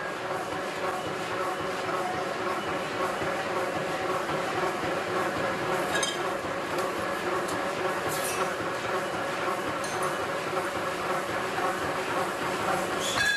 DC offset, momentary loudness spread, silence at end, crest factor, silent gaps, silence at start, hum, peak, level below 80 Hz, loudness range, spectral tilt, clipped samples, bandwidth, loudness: under 0.1%; 3 LU; 0 s; 16 dB; none; 0 s; none; -14 dBFS; -58 dBFS; 1 LU; -3.5 dB/octave; under 0.1%; 14 kHz; -29 LUFS